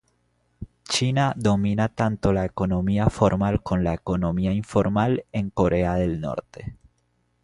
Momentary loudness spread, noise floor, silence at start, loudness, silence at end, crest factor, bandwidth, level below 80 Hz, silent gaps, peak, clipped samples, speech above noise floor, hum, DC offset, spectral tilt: 11 LU; -69 dBFS; 0.6 s; -23 LUFS; 0.7 s; 20 dB; 11.5 kHz; -40 dBFS; none; -2 dBFS; under 0.1%; 46 dB; none; under 0.1%; -6.5 dB/octave